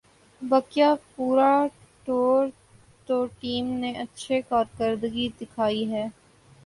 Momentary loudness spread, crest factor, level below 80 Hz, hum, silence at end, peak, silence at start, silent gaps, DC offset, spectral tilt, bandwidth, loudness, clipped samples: 10 LU; 18 dB; -60 dBFS; none; 0.55 s; -8 dBFS; 0.4 s; none; under 0.1%; -5.5 dB/octave; 11.5 kHz; -25 LUFS; under 0.1%